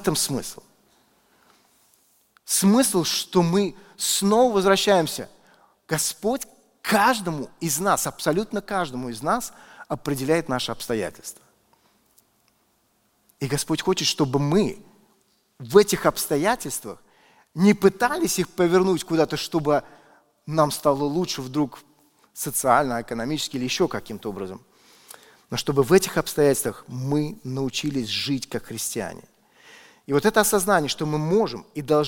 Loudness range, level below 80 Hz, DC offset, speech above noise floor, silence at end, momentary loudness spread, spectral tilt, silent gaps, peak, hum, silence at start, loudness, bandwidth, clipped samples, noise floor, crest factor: 6 LU; -52 dBFS; under 0.1%; 44 dB; 0 s; 13 LU; -4 dB/octave; none; -2 dBFS; none; 0 s; -23 LUFS; 17 kHz; under 0.1%; -66 dBFS; 22 dB